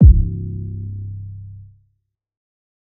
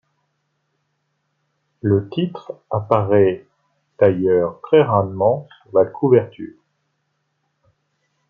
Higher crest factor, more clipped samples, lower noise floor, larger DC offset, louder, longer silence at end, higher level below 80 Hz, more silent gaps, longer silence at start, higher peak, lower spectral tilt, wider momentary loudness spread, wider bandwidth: about the same, 18 dB vs 18 dB; neither; about the same, -69 dBFS vs -71 dBFS; neither; second, -21 LUFS vs -18 LUFS; second, 1.35 s vs 1.85 s; first, -20 dBFS vs -62 dBFS; neither; second, 0 s vs 1.85 s; about the same, 0 dBFS vs -2 dBFS; first, -18 dB/octave vs -10.5 dB/octave; first, 22 LU vs 14 LU; second, 0.6 kHz vs 4.9 kHz